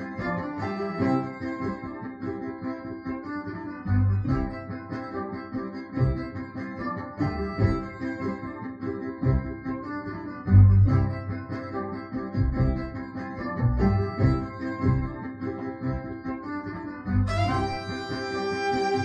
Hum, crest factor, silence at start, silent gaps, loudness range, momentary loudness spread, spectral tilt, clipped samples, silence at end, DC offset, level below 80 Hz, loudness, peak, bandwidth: none; 22 dB; 0 s; none; 7 LU; 11 LU; -8.5 dB/octave; under 0.1%; 0 s; under 0.1%; -38 dBFS; -28 LUFS; -6 dBFS; 7.6 kHz